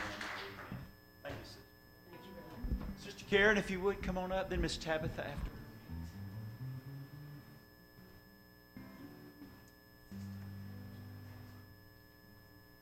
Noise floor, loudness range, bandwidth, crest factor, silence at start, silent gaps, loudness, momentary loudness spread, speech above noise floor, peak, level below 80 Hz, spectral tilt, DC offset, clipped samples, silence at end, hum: -61 dBFS; 17 LU; 16.5 kHz; 24 dB; 0 s; none; -39 LUFS; 23 LU; 26 dB; -18 dBFS; -52 dBFS; -5 dB/octave; under 0.1%; under 0.1%; 0 s; none